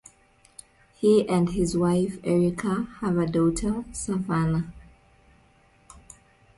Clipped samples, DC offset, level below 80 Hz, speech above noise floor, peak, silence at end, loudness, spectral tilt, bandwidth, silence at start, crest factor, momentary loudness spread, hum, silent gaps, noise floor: under 0.1%; under 0.1%; -46 dBFS; 36 dB; -10 dBFS; 0.6 s; -25 LUFS; -7 dB/octave; 11.5 kHz; 1 s; 18 dB; 8 LU; none; none; -59 dBFS